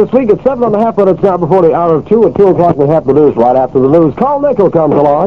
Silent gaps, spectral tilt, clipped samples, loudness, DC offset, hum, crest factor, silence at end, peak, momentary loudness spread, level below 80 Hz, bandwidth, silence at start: none; -10.5 dB/octave; 2%; -9 LUFS; 0.9%; none; 8 dB; 0 s; 0 dBFS; 3 LU; -40 dBFS; 6 kHz; 0 s